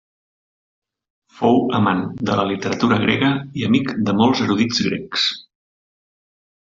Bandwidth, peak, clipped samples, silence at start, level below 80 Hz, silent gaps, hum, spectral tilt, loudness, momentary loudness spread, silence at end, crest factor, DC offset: 7.6 kHz; -4 dBFS; under 0.1%; 1.35 s; -56 dBFS; none; none; -5.5 dB/octave; -18 LUFS; 5 LU; 1.25 s; 18 dB; under 0.1%